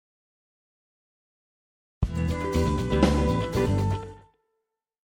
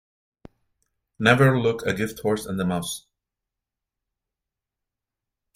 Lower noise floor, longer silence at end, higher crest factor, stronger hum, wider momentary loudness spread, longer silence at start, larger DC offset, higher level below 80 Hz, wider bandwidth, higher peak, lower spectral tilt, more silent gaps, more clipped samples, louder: second, -81 dBFS vs -86 dBFS; second, 0.85 s vs 2.55 s; about the same, 22 dB vs 24 dB; neither; about the same, 10 LU vs 11 LU; first, 2 s vs 1.2 s; neither; first, -36 dBFS vs -56 dBFS; about the same, 17 kHz vs 16 kHz; second, -6 dBFS vs -2 dBFS; first, -7 dB/octave vs -5.5 dB/octave; neither; neither; second, -26 LUFS vs -22 LUFS